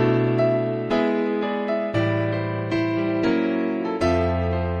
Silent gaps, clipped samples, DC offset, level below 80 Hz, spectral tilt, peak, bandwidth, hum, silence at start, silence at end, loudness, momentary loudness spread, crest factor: none; under 0.1%; under 0.1%; -42 dBFS; -8 dB/octave; -8 dBFS; 9.2 kHz; none; 0 s; 0 s; -23 LUFS; 4 LU; 12 dB